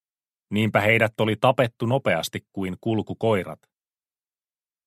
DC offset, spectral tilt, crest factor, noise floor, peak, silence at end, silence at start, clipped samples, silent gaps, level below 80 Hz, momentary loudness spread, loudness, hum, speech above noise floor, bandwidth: under 0.1%; -6 dB/octave; 20 dB; under -90 dBFS; -4 dBFS; 1.3 s; 0.5 s; under 0.1%; none; -62 dBFS; 11 LU; -23 LUFS; none; over 67 dB; 15.5 kHz